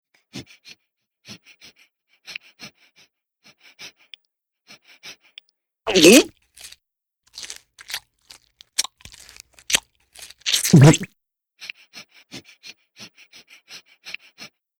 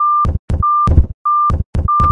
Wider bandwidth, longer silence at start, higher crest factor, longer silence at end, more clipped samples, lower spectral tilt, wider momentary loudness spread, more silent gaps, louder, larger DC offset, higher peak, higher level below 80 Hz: first, 18 kHz vs 7.2 kHz; first, 0.35 s vs 0 s; first, 22 dB vs 12 dB; first, 0.7 s vs 0 s; neither; second, -4.5 dB/octave vs -9 dB/octave; first, 31 LU vs 5 LU; second, none vs 0.39-0.48 s, 1.14-1.25 s, 1.65-1.73 s; second, -17 LUFS vs -14 LUFS; neither; about the same, -2 dBFS vs 0 dBFS; second, -54 dBFS vs -20 dBFS